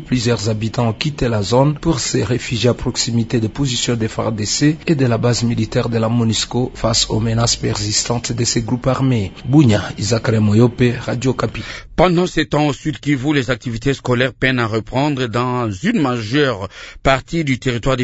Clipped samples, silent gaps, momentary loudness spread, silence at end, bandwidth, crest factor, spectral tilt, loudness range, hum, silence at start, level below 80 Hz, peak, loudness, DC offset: under 0.1%; none; 5 LU; 0 s; 8 kHz; 16 dB; -5 dB/octave; 2 LU; none; 0 s; -36 dBFS; 0 dBFS; -17 LUFS; under 0.1%